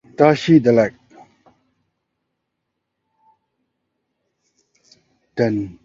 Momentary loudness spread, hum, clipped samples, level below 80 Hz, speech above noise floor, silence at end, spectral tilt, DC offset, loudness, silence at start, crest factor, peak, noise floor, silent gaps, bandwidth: 10 LU; none; under 0.1%; -58 dBFS; 62 dB; 0.15 s; -7.5 dB/octave; under 0.1%; -16 LUFS; 0.2 s; 22 dB; 0 dBFS; -77 dBFS; none; 7.6 kHz